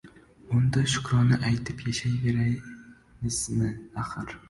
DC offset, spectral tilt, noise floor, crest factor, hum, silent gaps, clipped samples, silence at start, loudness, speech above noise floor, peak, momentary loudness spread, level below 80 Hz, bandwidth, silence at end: under 0.1%; -5 dB/octave; -49 dBFS; 16 dB; none; none; under 0.1%; 0.05 s; -27 LUFS; 23 dB; -12 dBFS; 11 LU; -48 dBFS; 11.5 kHz; 0.1 s